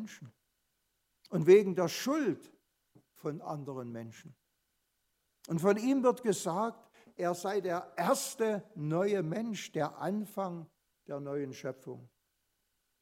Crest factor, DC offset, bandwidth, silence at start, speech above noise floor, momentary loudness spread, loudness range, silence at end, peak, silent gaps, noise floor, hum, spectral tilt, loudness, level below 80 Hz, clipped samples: 24 dB; under 0.1%; 16 kHz; 0 s; 48 dB; 16 LU; 8 LU; 0.95 s; -10 dBFS; none; -80 dBFS; none; -5.5 dB/octave; -33 LUFS; -82 dBFS; under 0.1%